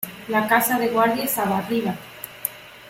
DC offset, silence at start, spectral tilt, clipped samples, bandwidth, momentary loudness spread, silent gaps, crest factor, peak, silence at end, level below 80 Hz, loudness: under 0.1%; 0 s; -4 dB/octave; under 0.1%; 17 kHz; 11 LU; none; 20 dB; -4 dBFS; 0 s; -62 dBFS; -22 LUFS